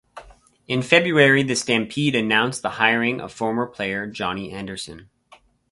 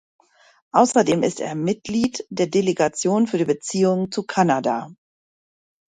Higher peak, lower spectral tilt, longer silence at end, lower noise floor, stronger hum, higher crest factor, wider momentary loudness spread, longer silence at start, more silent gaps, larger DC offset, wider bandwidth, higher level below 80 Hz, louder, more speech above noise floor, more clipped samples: about the same, 0 dBFS vs -2 dBFS; about the same, -4.5 dB/octave vs -5 dB/octave; second, 0.7 s vs 1.05 s; second, -54 dBFS vs under -90 dBFS; neither; about the same, 22 dB vs 20 dB; first, 15 LU vs 7 LU; second, 0.15 s vs 0.75 s; neither; neither; about the same, 11.5 kHz vs 11 kHz; first, -56 dBFS vs -62 dBFS; about the same, -20 LUFS vs -21 LUFS; second, 33 dB vs over 70 dB; neither